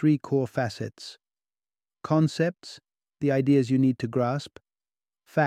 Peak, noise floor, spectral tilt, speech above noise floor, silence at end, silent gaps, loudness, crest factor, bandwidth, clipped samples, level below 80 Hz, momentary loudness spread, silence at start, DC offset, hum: -8 dBFS; under -90 dBFS; -7.5 dB/octave; over 65 dB; 0 s; none; -26 LUFS; 18 dB; 11 kHz; under 0.1%; -66 dBFS; 21 LU; 0 s; under 0.1%; none